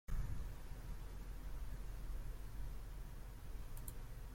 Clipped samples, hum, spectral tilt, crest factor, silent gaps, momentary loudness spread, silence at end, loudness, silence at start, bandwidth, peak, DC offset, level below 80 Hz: under 0.1%; none; -5.5 dB/octave; 16 dB; none; 5 LU; 0 s; -52 LUFS; 0.1 s; 16.5 kHz; -30 dBFS; under 0.1%; -48 dBFS